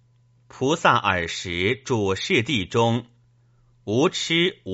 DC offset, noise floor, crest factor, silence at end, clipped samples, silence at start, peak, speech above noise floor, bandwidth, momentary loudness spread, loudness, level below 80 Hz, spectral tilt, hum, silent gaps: under 0.1%; -59 dBFS; 20 dB; 0 s; under 0.1%; 0.55 s; -4 dBFS; 37 dB; 8 kHz; 8 LU; -22 LUFS; -56 dBFS; -3.5 dB/octave; none; none